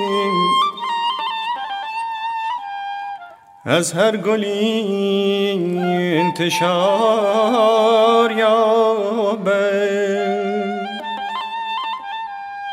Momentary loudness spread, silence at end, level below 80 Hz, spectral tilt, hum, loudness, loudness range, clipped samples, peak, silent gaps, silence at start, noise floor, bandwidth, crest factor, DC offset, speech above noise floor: 12 LU; 0 s; -72 dBFS; -4.5 dB/octave; none; -18 LUFS; 6 LU; under 0.1%; 0 dBFS; none; 0 s; -38 dBFS; 16 kHz; 18 dB; under 0.1%; 22 dB